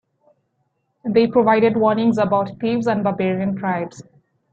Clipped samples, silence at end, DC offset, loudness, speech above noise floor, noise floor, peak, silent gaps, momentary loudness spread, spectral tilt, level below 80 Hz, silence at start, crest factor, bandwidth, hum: under 0.1%; 0.5 s; under 0.1%; -18 LUFS; 52 dB; -70 dBFS; -2 dBFS; none; 8 LU; -7.5 dB/octave; -60 dBFS; 1.05 s; 16 dB; 7.6 kHz; none